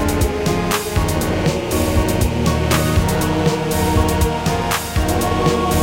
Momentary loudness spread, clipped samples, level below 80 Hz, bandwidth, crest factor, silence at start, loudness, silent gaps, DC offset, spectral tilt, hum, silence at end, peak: 3 LU; under 0.1%; -24 dBFS; 17 kHz; 16 dB; 0 s; -18 LUFS; none; under 0.1%; -5 dB/octave; none; 0 s; 0 dBFS